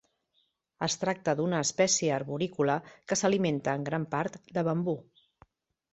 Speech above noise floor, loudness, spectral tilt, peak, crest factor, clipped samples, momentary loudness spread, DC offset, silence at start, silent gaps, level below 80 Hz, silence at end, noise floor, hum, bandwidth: 45 dB; -30 LUFS; -4 dB/octave; -12 dBFS; 18 dB; under 0.1%; 8 LU; under 0.1%; 0.8 s; none; -68 dBFS; 0.9 s; -75 dBFS; none; 8.4 kHz